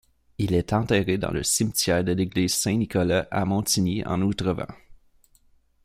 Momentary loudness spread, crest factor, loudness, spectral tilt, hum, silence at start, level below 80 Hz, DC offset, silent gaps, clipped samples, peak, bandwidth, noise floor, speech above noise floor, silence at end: 4 LU; 18 dB; -24 LUFS; -4.5 dB/octave; none; 0.4 s; -48 dBFS; under 0.1%; none; under 0.1%; -6 dBFS; 16 kHz; -60 dBFS; 37 dB; 0.9 s